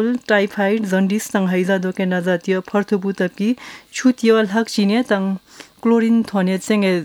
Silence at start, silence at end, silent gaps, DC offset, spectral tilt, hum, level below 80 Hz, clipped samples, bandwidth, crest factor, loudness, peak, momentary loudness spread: 0 s; 0 s; none; under 0.1%; -6 dB/octave; none; -64 dBFS; under 0.1%; 17 kHz; 16 dB; -18 LUFS; -2 dBFS; 6 LU